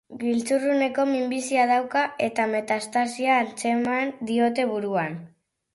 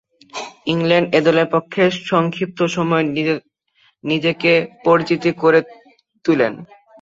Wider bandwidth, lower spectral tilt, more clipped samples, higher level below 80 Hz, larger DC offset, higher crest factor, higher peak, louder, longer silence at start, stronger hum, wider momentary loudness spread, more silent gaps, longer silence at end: first, 11.5 kHz vs 7.8 kHz; second, -4.5 dB/octave vs -6 dB/octave; neither; second, -70 dBFS vs -60 dBFS; neither; about the same, 16 dB vs 16 dB; second, -8 dBFS vs -2 dBFS; second, -24 LUFS vs -17 LUFS; second, 0.1 s vs 0.35 s; neither; second, 5 LU vs 11 LU; neither; first, 0.5 s vs 0.35 s